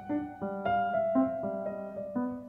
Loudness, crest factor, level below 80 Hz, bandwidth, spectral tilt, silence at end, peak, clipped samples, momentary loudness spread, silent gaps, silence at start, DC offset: -32 LUFS; 14 dB; -64 dBFS; 3.8 kHz; -9 dB/octave; 0 s; -18 dBFS; under 0.1%; 9 LU; none; 0 s; under 0.1%